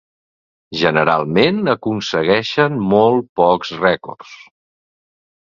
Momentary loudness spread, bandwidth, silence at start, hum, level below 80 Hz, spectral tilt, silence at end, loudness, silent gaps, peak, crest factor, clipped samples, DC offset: 7 LU; 7.4 kHz; 0.7 s; none; -52 dBFS; -6 dB/octave; 1.15 s; -16 LUFS; 3.29-3.36 s; 0 dBFS; 18 dB; under 0.1%; under 0.1%